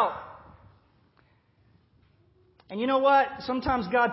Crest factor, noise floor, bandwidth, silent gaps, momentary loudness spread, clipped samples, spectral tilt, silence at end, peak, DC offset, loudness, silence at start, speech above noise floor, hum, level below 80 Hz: 18 dB; -64 dBFS; 5.8 kHz; none; 19 LU; under 0.1%; -9 dB/octave; 0 s; -10 dBFS; under 0.1%; -25 LUFS; 0 s; 40 dB; none; -54 dBFS